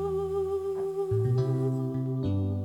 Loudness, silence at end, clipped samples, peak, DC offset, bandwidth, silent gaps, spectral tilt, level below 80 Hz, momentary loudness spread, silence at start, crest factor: -29 LUFS; 0 s; under 0.1%; -16 dBFS; under 0.1%; 11 kHz; none; -10 dB/octave; -54 dBFS; 4 LU; 0 s; 12 dB